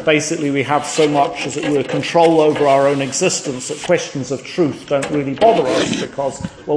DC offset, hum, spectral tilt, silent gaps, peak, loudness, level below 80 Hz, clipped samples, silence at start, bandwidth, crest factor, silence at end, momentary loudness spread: under 0.1%; none; -4.5 dB/octave; none; 0 dBFS; -16 LUFS; -52 dBFS; under 0.1%; 0 s; 10.5 kHz; 16 dB; 0 s; 10 LU